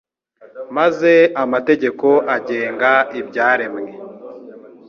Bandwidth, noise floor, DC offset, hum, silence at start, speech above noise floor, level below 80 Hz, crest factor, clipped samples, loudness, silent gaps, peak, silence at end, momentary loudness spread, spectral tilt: 6.8 kHz; -48 dBFS; under 0.1%; none; 0.55 s; 32 dB; -66 dBFS; 16 dB; under 0.1%; -16 LUFS; none; -2 dBFS; 0.2 s; 22 LU; -6 dB/octave